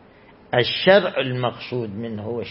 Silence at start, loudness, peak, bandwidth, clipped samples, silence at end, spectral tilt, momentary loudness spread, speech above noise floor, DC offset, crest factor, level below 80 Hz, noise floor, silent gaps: 0.5 s; -21 LUFS; -2 dBFS; 5.8 kHz; under 0.1%; 0 s; -10 dB/octave; 13 LU; 28 dB; under 0.1%; 20 dB; -58 dBFS; -49 dBFS; none